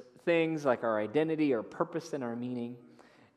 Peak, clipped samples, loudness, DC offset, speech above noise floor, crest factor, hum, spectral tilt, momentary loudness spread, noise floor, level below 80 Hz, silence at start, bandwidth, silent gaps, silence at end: -14 dBFS; under 0.1%; -32 LUFS; under 0.1%; 27 dB; 18 dB; none; -6.5 dB/octave; 9 LU; -59 dBFS; -84 dBFS; 0 s; 11.5 kHz; none; 0.5 s